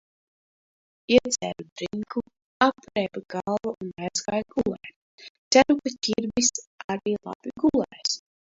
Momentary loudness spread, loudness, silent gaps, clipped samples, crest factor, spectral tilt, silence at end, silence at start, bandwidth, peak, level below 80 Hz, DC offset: 13 LU; -26 LUFS; 1.72-1.76 s, 2.44-2.60 s, 4.96-5.18 s, 5.30-5.51 s, 6.67-6.78 s, 6.84-6.89 s, 7.35-7.40 s; under 0.1%; 24 dB; -3 dB/octave; 0.35 s; 1.1 s; 8 kHz; -2 dBFS; -58 dBFS; under 0.1%